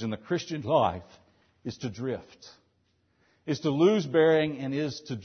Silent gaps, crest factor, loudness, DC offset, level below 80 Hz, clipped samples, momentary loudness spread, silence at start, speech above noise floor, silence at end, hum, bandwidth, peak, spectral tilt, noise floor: none; 18 dB; -27 LUFS; under 0.1%; -64 dBFS; under 0.1%; 17 LU; 0 s; 44 dB; 0 s; none; 6.6 kHz; -10 dBFS; -6.5 dB/octave; -71 dBFS